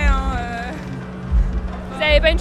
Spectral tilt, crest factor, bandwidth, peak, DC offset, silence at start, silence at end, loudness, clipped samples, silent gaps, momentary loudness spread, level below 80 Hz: -6 dB/octave; 16 dB; 9 kHz; -2 dBFS; under 0.1%; 0 s; 0 s; -21 LUFS; under 0.1%; none; 14 LU; -22 dBFS